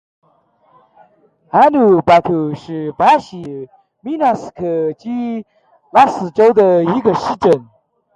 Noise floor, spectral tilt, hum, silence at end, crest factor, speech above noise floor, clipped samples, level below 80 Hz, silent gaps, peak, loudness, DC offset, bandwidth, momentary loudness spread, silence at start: -56 dBFS; -7 dB/octave; none; 0.55 s; 16 dB; 42 dB; under 0.1%; -54 dBFS; none; 0 dBFS; -14 LUFS; under 0.1%; 10.5 kHz; 16 LU; 1.55 s